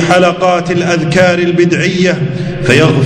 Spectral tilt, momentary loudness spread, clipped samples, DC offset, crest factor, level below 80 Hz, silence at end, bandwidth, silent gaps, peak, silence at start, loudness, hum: -6 dB/octave; 5 LU; 0.9%; under 0.1%; 10 dB; -38 dBFS; 0 s; 11 kHz; none; 0 dBFS; 0 s; -10 LUFS; none